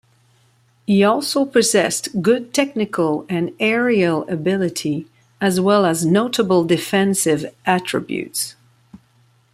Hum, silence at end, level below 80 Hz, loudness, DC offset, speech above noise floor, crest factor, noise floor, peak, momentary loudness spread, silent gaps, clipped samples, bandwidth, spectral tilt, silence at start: none; 0.55 s; -62 dBFS; -18 LUFS; under 0.1%; 39 dB; 16 dB; -57 dBFS; -2 dBFS; 8 LU; none; under 0.1%; 16 kHz; -4.5 dB/octave; 0.9 s